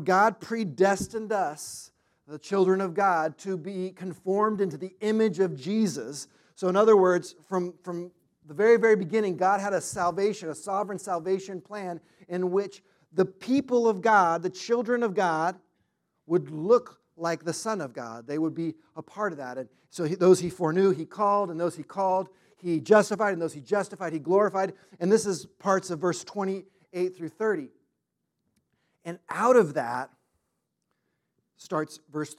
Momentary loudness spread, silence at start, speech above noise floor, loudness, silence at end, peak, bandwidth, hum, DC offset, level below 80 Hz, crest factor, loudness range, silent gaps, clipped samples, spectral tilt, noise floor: 16 LU; 0 s; 55 dB; -26 LUFS; 0.05 s; -6 dBFS; 14 kHz; none; under 0.1%; -72 dBFS; 20 dB; 5 LU; none; under 0.1%; -5.5 dB/octave; -81 dBFS